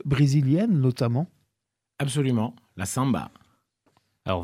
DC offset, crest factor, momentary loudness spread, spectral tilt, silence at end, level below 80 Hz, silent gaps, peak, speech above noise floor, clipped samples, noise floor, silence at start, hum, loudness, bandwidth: under 0.1%; 16 dB; 13 LU; -6.5 dB/octave; 0 s; -54 dBFS; none; -10 dBFS; 60 dB; under 0.1%; -83 dBFS; 0.05 s; none; -25 LUFS; 14.5 kHz